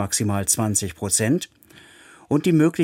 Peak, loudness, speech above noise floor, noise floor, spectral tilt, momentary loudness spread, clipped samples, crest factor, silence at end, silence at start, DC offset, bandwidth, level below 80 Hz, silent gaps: -4 dBFS; -21 LUFS; 28 dB; -49 dBFS; -4.5 dB/octave; 6 LU; under 0.1%; 16 dB; 0 s; 0 s; under 0.1%; 17 kHz; -54 dBFS; none